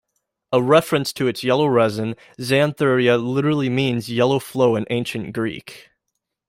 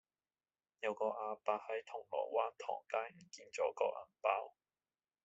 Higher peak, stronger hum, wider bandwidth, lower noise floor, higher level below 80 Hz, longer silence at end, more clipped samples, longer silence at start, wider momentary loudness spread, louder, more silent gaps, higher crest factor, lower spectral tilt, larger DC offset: first, -2 dBFS vs -18 dBFS; neither; first, 16 kHz vs 8 kHz; second, -78 dBFS vs under -90 dBFS; first, -58 dBFS vs under -90 dBFS; about the same, 0.7 s vs 0.75 s; neither; second, 0.5 s vs 0.8 s; about the same, 10 LU vs 8 LU; first, -19 LUFS vs -41 LUFS; neither; second, 18 dB vs 24 dB; first, -6 dB/octave vs -1 dB/octave; neither